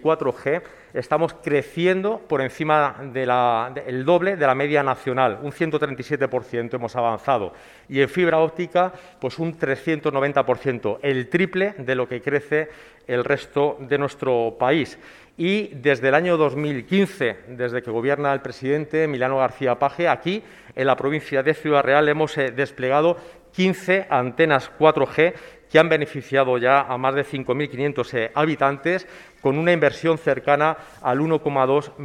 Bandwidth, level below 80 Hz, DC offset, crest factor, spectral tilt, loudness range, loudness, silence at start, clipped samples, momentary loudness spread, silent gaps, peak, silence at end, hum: 12.5 kHz; -60 dBFS; under 0.1%; 22 dB; -6.5 dB/octave; 3 LU; -21 LUFS; 0 s; under 0.1%; 8 LU; none; 0 dBFS; 0 s; none